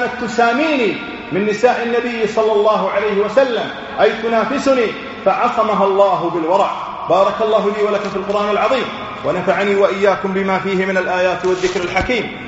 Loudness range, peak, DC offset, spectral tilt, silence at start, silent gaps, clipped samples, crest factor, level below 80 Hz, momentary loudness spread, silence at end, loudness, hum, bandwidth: 1 LU; 0 dBFS; under 0.1%; -3.5 dB/octave; 0 s; none; under 0.1%; 16 dB; -46 dBFS; 5 LU; 0 s; -16 LUFS; none; 8 kHz